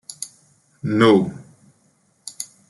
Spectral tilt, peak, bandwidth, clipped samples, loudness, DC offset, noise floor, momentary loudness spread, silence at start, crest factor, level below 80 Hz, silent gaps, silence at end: -5.5 dB/octave; -2 dBFS; 12 kHz; under 0.1%; -18 LUFS; under 0.1%; -62 dBFS; 24 LU; 0.2 s; 20 dB; -64 dBFS; none; 0.25 s